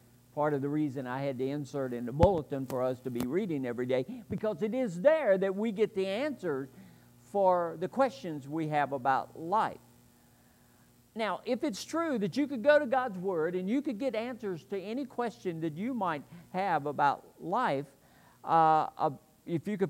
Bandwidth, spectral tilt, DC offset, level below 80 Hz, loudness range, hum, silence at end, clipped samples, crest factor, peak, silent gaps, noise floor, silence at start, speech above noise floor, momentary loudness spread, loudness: 16 kHz; -6.5 dB/octave; under 0.1%; -56 dBFS; 4 LU; 60 Hz at -60 dBFS; 0 s; under 0.1%; 24 dB; -8 dBFS; none; -62 dBFS; 0.35 s; 32 dB; 11 LU; -31 LUFS